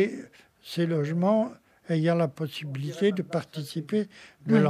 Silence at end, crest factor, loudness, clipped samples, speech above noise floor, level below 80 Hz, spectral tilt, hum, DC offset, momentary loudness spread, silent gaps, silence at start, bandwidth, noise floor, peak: 0 s; 18 dB; -28 LUFS; under 0.1%; 20 dB; -74 dBFS; -7.5 dB/octave; none; under 0.1%; 12 LU; none; 0 s; 15 kHz; -46 dBFS; -10 dBFS